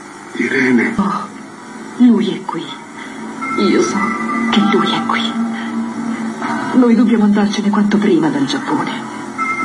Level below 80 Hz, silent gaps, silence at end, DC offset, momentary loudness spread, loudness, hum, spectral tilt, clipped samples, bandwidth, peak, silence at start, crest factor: -56 dBFS; none; 0 s; under 0.1%; 16 LU; -15 LUFS; none; -5.5 dB/octave; under 0.1%; 11.5 kHz; -2 dBFS; 0 s; 14 dB